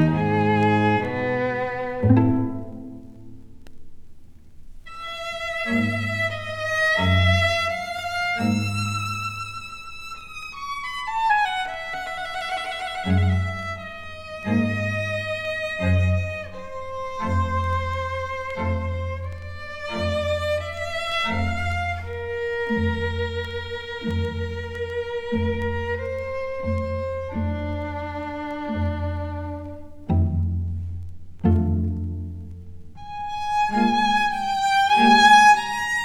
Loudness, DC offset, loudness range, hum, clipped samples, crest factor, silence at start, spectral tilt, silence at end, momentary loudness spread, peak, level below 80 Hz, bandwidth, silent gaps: -23 LUFS; under 0.1%; 6 LU; none; under 0.1%; 20 dB; 0 s; -5.5 dB/octave; 0 s; 15 LU; -4 dBFS; -40 dBFS; 13.5 kHz; none